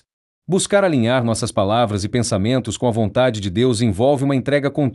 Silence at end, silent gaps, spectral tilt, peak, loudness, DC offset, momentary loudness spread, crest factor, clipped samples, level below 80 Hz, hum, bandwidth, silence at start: 0 s; none; -5.5 dB/octave; -4 dBFS; -18 LUFS; under 0.1%; 4 LU; 14 dB; under 0.1%; -50 dBFS; none; 12 kHz; 0.5 s